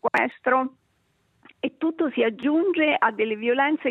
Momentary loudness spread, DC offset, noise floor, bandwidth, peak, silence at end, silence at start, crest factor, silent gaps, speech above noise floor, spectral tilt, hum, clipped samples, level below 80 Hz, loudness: 7 LU; under 0.1%; -68 dBFS; 6.6 kHz; -6 dBFS; 0 s; 0.05 s; 18 dB; none; 45 dB; -6 dB/octave; none; under 0.1%; -76 dBFS; -23 LUFS